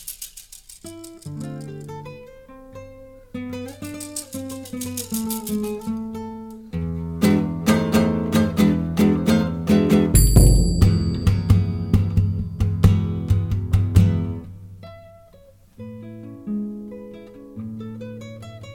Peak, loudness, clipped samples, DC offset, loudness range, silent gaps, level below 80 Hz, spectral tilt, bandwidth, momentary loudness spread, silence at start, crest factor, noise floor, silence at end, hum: 0 dBFS; -20 LUFS; under 0.1%; under 0.1%; 17 LU; none; -28 dBFS; -6.5 dB/octave; 17.5 kHz; 22 LU; 0 s; 20 dB; -50 dBFS; 0 s; none